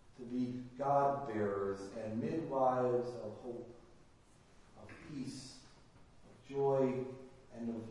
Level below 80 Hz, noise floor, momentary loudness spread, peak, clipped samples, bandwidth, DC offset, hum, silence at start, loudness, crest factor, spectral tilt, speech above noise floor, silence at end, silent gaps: -68 dBFS; -64 dBFS; 21 LU; -20 dBFS; under 0.1%; 11.5 kHz; under 0.1%; none; 0.05 s; -38 LUFS; 18 dB; -7.5 dB/octave; 27 dB; 0 s; none